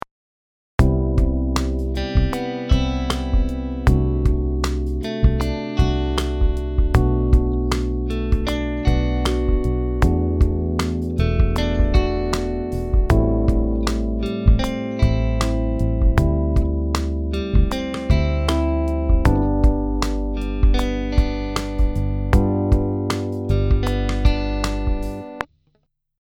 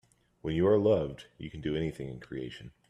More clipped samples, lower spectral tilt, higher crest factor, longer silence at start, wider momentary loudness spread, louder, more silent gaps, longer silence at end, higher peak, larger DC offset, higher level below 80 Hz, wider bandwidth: neither; about the same, -7 dB/octave vs -8 dB/octave; about the same, 18 dB vs 18 dB; first, 0.8 s vs 0.45 s; second, 6 LU vs 17 LU; first, -21 LUFS vs -31 LUFS; neither; first, 0.75 s vs 0.2 s; first, 0 dBFS vs -14 dBFS; neither; first, -20 dBFS vs -56 dBFS; first, 12.5 kHz vs 10.5 kHz